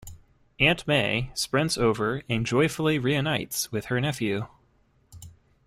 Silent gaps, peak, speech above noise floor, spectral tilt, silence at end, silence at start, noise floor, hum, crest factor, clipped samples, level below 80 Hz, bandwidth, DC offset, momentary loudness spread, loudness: none; -6 dBFS; 39 dB; -4.5 dB/octave; 0.35 s; 0.05 s; -64 dBFS; none; 20 dB; under 0.1%; -50 dBFS; 16 kHz; under 0.1%; 6 LU; -25 LUFS